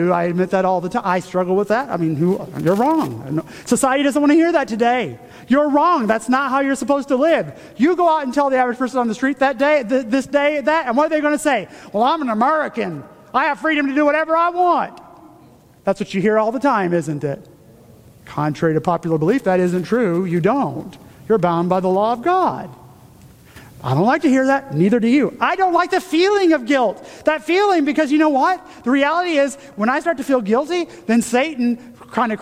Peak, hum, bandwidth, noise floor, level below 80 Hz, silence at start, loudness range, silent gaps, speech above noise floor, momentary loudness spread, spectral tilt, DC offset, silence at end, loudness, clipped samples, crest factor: -2 dBFS; none; 16 kHz; -47 dBFS; -56 dBFS; 0 s; 4 LU; none; 30 dB; 8 LU; -6 dB/octave; under 0.1%; 0 s; -18 LUFS; under 0.1%; 16 dB